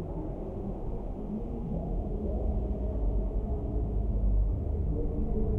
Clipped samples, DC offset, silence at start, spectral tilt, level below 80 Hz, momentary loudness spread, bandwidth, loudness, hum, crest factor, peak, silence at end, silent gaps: under 0.1%; under 0.1%; 0 s; -12 dB/octave; -32 dBFS; 7 LU; 1.6 kHz; -34 LUFS; none; 12 dB; -18 dBFS; 0 s; none